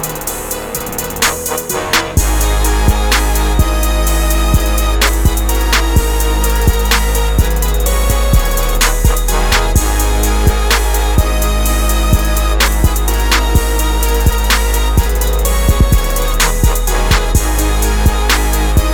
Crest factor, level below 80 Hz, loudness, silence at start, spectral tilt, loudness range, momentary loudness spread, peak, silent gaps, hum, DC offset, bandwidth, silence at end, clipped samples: 12 dB; -14 dBFS; -13 LUFS; 0 s; -4 dB/octave; 0 LU; 3 LU; 0 dBFS; none; none; under 0.1%; 20 kHz; 0 s; under 0.1%